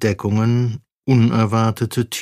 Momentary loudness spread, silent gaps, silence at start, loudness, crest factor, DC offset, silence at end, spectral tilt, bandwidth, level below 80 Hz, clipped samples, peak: 7 LU; 0.97-1.02 s; 0 s; -18 LUFS; 14 dB; under 0.1%; 0 s; -6.5 dB/octave; 15.5 kHz; -52 dBFS; under 0.1%; -4 dBFS